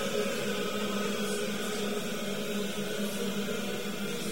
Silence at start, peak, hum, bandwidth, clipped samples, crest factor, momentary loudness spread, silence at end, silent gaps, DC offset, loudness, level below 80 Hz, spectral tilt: 0 s; -18 dBFS; none; 16.5 kHz; under 0.1%; 14 dB; 3 LU; 0 s; none; 1%; -33 LUFS; -66 dBFS; -3.5 dB/octave